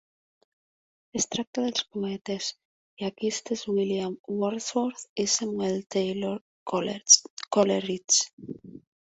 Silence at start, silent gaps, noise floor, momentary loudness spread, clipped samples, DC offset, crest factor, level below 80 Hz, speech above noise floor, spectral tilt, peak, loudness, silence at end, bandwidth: 1.15 s; 1.47-1.53 s, 2.21-2.25 s, 2.65-2.97 s, 4.19-4.24 s, 5.09-5.16 s, 6.41-6.66 s, 7.30-7.37 s, 8.33-8.38 s; under -90 dBFS; 13 LU; under 0.1%; under 0.1%; 26 dB; -68 dBFS; over 63 dB; -2.5 dB/octave; -4 dBFS; -26 LUFS; 0.3 s; 8.4 kHz